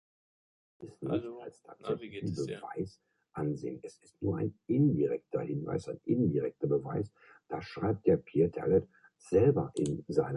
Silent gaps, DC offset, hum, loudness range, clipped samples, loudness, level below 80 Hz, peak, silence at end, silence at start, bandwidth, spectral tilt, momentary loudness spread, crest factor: none; under 0.1%; none; 8 LU; under 0.1%; -33 LUFS; -58 dBFS; -14 dBFS; 0 s; 0.8 s; 11 kHz; -8.5 dB/octave; 15 LU; 20 dB